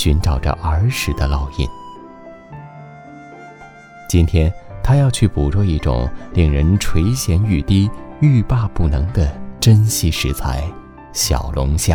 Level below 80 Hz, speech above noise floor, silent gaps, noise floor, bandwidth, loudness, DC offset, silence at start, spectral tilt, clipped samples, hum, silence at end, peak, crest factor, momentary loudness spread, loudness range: -24 dBFS; 24 dB; none; -39 dBFS; 19.5 kHz; -17 LUFS; under 0.1%; 0 s; -5.5 dB/octave; under 0.1%; none; 0 s; 0 dBFS; 16 dB; 23 LU; 7 LU